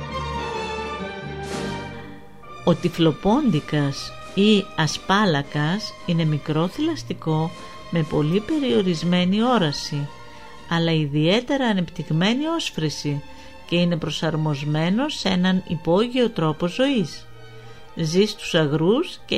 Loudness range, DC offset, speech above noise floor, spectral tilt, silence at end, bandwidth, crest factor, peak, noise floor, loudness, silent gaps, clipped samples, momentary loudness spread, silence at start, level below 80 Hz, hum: 2 LU; 0.8%; 21 dB; -6 dB/octave; 0 s; 13 kHz; 18 dB; -4 dBFS; -42 dBFS; -22 LUFS; none; under 0.1%; 11 LU; 0 s; -48 dBFS; none